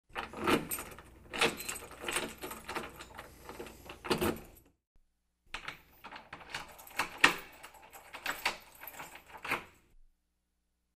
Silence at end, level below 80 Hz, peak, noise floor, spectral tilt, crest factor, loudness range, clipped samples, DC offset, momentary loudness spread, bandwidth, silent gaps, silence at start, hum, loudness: 0.95 s; -60 dBFS; -6 dBFS; -81 dBFS; -2.5 dB/octave; 34 dB; 6 LU; under 0.1%; under 0.1%; 19 LU; 15.5 kHz; 4.87-4.95 s; 0.15 s; 60 Hz at -75 dBFS; -35 LUFS